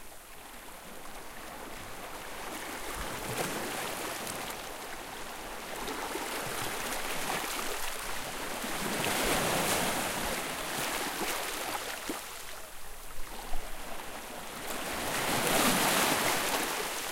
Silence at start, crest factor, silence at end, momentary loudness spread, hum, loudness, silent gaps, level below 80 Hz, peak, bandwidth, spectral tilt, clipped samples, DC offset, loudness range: 0 s; 20 dB; 0 s; 16 LU; none; -33 LUFS; none; -48 dBFS; -14 dBFS; 17 kHz; -2 dB/octave; under 0.1%; under 0.1%; 9 LU